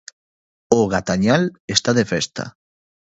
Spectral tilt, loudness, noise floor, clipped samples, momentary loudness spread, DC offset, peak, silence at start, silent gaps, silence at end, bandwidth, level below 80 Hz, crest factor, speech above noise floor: -4.5 dB/octave; -19 LUFS; under -90 dBFS; under 0.1%; 9 LU; under 0.1%; 0 dBFS; 0.7 s; 1.60-1.68 s; 0.6 s; 8.2 kHz; -50 dBFS; 20 dB; over 71 dB